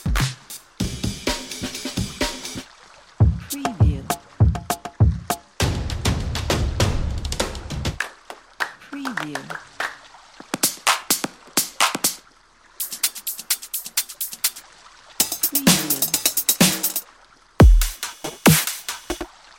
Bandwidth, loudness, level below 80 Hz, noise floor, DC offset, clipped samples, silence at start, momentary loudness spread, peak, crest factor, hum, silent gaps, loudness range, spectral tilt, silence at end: 17 kHz; -22 LUFS; -28 dBFS; -53 dBFS; under 0.1%; under 0.1%; 0 s; 14 LU; -2 dBFS; 20 dB; none; none; 8 LU; -3.5 dB/octave; 0.3 s